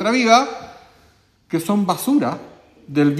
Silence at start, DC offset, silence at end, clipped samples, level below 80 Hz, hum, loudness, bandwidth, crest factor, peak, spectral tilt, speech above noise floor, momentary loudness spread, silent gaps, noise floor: 0 s; under 0.1%; 0 s; under 0.1%; -60 dBFS; none; -18 LUFS; 15 kHz; 18 dB; 0 dBFS; -5 dB/octave; 38 dB; 14 LU; none; -55 dBFS